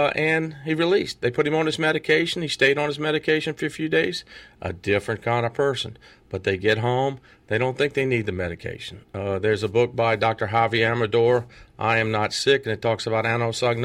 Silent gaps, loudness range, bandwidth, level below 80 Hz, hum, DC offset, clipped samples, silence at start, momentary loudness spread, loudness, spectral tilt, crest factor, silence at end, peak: none; 3 LU; 14 kHz; -56 dBFS; none; under 0.1%; under 0.1%; 0 s; 10 LU; -23 LUFS; -5 dB/octave; 18 dB; 0 s; -6 dBFS